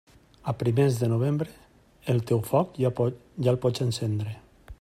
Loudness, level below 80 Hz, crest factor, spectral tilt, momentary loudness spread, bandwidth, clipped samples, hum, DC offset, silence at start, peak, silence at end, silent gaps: -27 LUFS; -56 dBFS; 16 dB; -7.5 dB/octave; 13 LU; 15.5 kHz; under 0.1%; none; under 0.1%; 0.45 s; -10 dBFS; 0.1 s; none